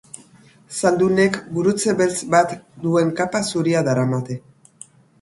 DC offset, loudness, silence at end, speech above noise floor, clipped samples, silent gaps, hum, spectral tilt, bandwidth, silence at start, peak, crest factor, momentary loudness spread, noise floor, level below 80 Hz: under 0.1%; -19 LUFS; 0.85 s; 31 dB; under 0.1%; none; none; -5.5 dB/octave; 11.5 kHz; 0.7 s; -2 dBFS; 18 dB; 14 LU; -50 dBFS; -58 dBFS